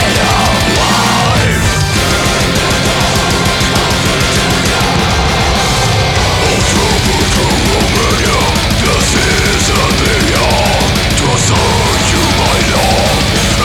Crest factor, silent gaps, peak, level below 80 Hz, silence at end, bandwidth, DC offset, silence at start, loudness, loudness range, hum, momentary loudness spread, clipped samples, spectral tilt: 10 dB; none; 0 dBFS; -20 dBFS; 0 s; 18.5 kHz; under 0.1%; 0 s; -10 LUFS; 1 LU; none; 1 LU; under 0.1%; -3.5 dB/octave